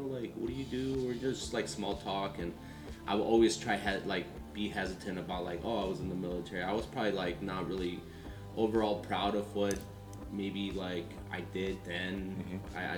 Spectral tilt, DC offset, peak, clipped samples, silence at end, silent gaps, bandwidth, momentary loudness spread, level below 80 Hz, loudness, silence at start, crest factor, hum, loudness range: -5 dB/octave; under 0.1%; -16 dBFS; under 0.1%; 0 s; none; 19.5 kHz; 10 LU; -52 dBFS; -36 LUFS; 0 s; 20 dB; none; 3 LU